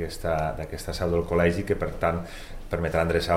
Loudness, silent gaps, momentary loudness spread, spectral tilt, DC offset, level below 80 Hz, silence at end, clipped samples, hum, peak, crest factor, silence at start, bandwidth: -27 LUFS; none; 10 LU; -6 dB/octave; under 0.1%; -38 dBFS; 0 s; under 0.1%; none; -8 dBFS; 18 dB; 0 s; 16 kHz